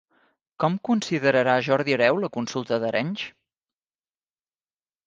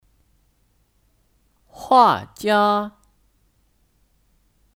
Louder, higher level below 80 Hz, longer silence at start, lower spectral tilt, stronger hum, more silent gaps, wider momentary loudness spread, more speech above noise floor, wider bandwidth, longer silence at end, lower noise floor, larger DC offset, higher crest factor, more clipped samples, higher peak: second, -23 LUFS vs -18 LUFS; second, -70 dBFS vs -60 dBFS; second, 0.6 s vs 1.8 s; about the same, -5.5 dB/octave vs -5 dB/octave; neither; neither; second, 9 LU vs 17 LU; first, over 67 dB vs 46 dB; second, 9.2 kHz vs 17 kHz; second, 1.75 s vs 1.9 s; first, under -90 dBFS vs -63 dBFS; neither; about the same, 20 dB vs 22 dB; neither; about the same, -4 dBFS vs -2 dBFS